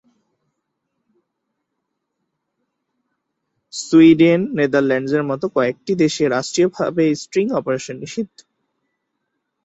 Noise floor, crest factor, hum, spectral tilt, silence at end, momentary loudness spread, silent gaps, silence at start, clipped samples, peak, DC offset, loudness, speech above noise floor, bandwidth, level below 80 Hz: -76 dBFS; 18 dB; none; -5.5 dB/octave; 1.4 s; 16 LU; none; 3.75 s; under 0.1%; -2 dBFS; under 0.1%; -17 LUFS; 60 dB; 8.2 kHz; -60 dBFS